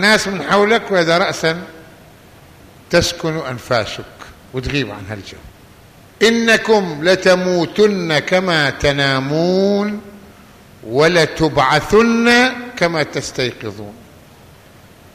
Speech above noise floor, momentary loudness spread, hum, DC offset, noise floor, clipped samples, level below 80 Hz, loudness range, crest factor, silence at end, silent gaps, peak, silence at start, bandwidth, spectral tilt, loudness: 28 dB; 16 LU; none; under 0.1%; -43 dBFS; under 0.1%; -42 dBFS; 7 LU; 14 dB; 1.15 s; none; -2 dBFS; 0 s; 15 kHz; -4.5 dB/octave; -15 LUFS